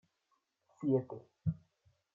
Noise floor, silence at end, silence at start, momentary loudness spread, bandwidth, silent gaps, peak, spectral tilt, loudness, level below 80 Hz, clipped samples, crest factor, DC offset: -81 dBFS; 0.6 s; 0.8 s; 16 LU; 7.2 kHz; none; -20 dBFS; -11.5 dB/octave; -37 LUFS; -66 dBFS; under 0.1%; 20 dB; under 0.1%